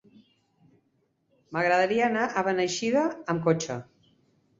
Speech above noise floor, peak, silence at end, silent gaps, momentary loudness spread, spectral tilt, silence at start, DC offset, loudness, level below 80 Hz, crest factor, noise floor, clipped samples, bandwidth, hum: 46 dB; -10 dBFS; 0.75 s; none; 9 LU; -5 dB/octave; 1.5 s; under 0.1%; -26 LUFS; -70 dBFS; 18 dB; -72 dBFS; under 0.1%; 8 kHz; none